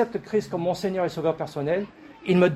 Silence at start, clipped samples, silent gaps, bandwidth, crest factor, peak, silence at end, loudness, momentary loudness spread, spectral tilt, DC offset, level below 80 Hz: 0 s; under 0.1%; none; 13.5 kHz; 16 dB; -8 dBFS; 0 s; -26 LUFS; 5 LU; -7 dB/octave; under 0.1%; -60 dBFS